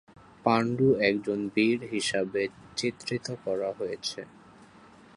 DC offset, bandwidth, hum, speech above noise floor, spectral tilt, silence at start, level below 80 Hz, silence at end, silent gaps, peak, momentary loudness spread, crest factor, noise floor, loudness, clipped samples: under 0.1%; 11.5 kHz; none; 26 dB; -5 dB/octave; 0.45 s; -64 dBFS; 0.5 s; none; -8 dBFS; 10 LU; 22 dB; -54 dBFS; -28 LUFS; under 0.1%